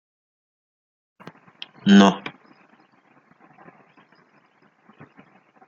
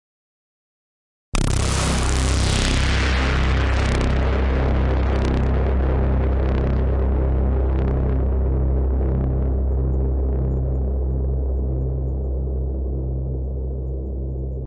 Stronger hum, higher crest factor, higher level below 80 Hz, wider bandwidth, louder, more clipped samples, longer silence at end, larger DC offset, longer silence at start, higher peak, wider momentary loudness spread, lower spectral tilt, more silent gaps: neither; first, 24 dB vs 16 dB; second, -66 dBFS vs -22 dBFS; second, 7.4 kHz vs 11.5 kHz; first, -17 LUFS vs -22 LUFS; neither; first, 3.4 s vs 0 s; neither; first, 1.85 s vs 1.35 s; first, 0 dBFS vs -4 dBFS; first, 27 LU vs 6 LU; about the same, -6 dB/octave vs -6 dB/octave; neither